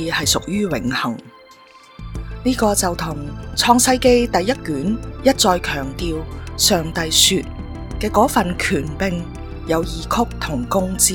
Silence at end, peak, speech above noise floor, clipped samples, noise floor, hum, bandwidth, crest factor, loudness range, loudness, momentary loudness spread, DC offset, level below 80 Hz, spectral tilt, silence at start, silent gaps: 0 s; 0 dBFS; 27 dB; under 0.1%; -45 dBFS; none; 18 kHz; 20 dB; 4 LU; -18 LUFS; 17 LU; under 0.1%; -34 dBFS; -3 dB/octave; 0 s; none